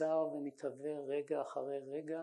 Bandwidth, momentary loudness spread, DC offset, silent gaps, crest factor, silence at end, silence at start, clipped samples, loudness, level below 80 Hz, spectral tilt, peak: 10.5 kHz; 7 LU; under 0.1%; none; 16 dB; 0 s; 0 s; under 0.1%; -40 LUFS; under -90 dBFS; -7 dB/octave; -24 dBFS